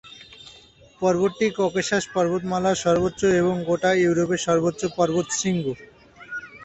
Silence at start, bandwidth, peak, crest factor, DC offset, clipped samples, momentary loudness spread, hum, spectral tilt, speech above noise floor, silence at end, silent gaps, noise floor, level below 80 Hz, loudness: 0.05 s; 8.4 kHz; -6 dBFS; 16 dB; under 0.1%; under 0.1%; 15 LU; none; -5 dB/octave; 29 dB; 0 s; none; -51 dBFS; -54 dBFS; -22 LUFS